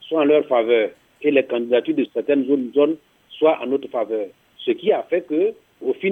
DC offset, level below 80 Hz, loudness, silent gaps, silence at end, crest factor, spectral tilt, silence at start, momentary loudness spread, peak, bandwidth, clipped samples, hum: under 0.1%; -74 dBFS; -20 LUFS; none; 0 s; 18 dB; -7.5 dB/octave; 0 s; 9 LU; -2 dBFS; 3.9 kHz; under 0.1%; none